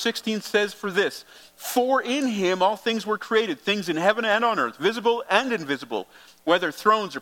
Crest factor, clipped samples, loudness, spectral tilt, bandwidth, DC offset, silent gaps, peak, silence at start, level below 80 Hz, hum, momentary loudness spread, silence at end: 22 dB; under 0.1%; -23 LUFS; -3.5 dB/octave; 17.5 kHz; under 0.1%; none; -2 dBFS; 0 s; -74 dBFS; none; 7 LU; 0 s